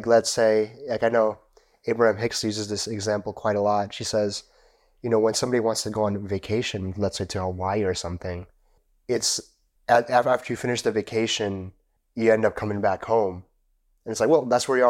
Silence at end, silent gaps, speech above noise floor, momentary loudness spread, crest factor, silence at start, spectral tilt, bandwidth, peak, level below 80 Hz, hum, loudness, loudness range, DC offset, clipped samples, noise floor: 0 s; none; 43 dB; 13 LU; 18 dB; 0 s; -4 dB/octave; 16 kHz; -6 dBFS; -58 dBFS; none; -24 LUFS; 4 LU; under 0.1%; under 0.1%; -67 dBFS